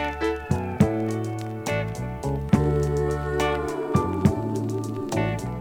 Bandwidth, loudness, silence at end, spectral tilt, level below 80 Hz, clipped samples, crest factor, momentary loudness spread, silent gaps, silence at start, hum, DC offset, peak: 19 kHz; -25 LUFS; 0 s; -7 dB/octave; -38 dBFS; under 0.1%; 20 dB; 7 LU; none; 0 s; none; under 0.1%; -6 dBFS